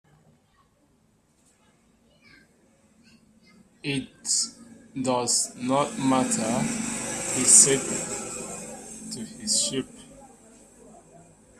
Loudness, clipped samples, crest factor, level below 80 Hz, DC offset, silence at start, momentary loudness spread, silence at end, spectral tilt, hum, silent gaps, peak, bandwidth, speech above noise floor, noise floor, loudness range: -23 LUFS; under 0.1%; 28 dB; -62 dBFS; under 0.1%; 3.85 s; 21 LU; 0.7 s; -2 dB/octave; none; none; 0 dBFS; 14.5 kHz; 41 dB; -64 dBFS; 11 LU